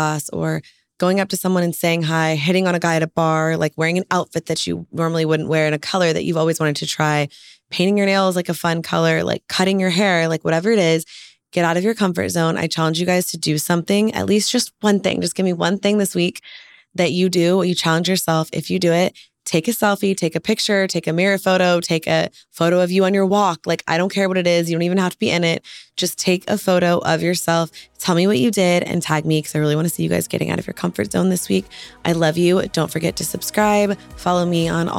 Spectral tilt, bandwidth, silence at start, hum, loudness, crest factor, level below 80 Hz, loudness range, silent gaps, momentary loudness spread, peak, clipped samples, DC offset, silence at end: -5 dB/octave; 17 kHz; 0 s; none; -18 LUFS; 16 dB; -54 dBFS; 2 LU; none; 6 LU; -2 dBFS; under 0.1%; under 0.1%; 0 s